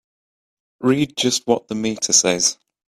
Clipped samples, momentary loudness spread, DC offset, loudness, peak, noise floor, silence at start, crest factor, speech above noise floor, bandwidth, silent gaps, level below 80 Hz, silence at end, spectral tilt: under 0.1%; 8 LU; under 0.1%; -18 LUFS; 0 dBFS; under -90 dBFS; 0.8 s; 20 dB; over 71 dB; 15 kHz; none; -60 dBFS; 0.35 s; -2.5 dB/octave